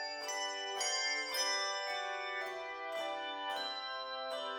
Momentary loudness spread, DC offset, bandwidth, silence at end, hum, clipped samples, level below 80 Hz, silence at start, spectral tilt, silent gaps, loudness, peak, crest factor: 7 LU; under 0.1%; over 20 kHz; 0 s; none; under 0.1%; -80 dBFS; 0 s; 2 dB/octave; none; -37 LUFS; -22 dBFS; 16 dB